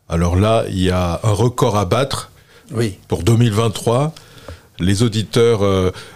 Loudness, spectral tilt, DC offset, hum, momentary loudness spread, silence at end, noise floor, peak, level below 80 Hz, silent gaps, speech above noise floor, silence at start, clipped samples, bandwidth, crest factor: -17 LUFS; -6 dB/octave; 0.8%; none; 8 LU; 0 s; -38 dBFS; -2 dBFS; -42 dBFS; none; 22 dB; 0.1 s; under 0.1%; 15.5 kHz; 16 dB